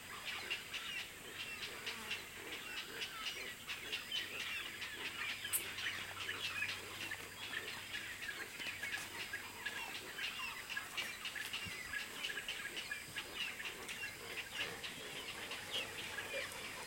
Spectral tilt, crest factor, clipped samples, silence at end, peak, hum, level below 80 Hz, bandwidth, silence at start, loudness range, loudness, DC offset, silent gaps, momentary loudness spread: -0.5 dB/octave; 22 dB; under 0.1%; 0 s; -24 dBFS; none; -72 dBFS; 16.5 kHz; 0 s; 2 LU; -43 LUFS; under 0.1%; none; 4 LU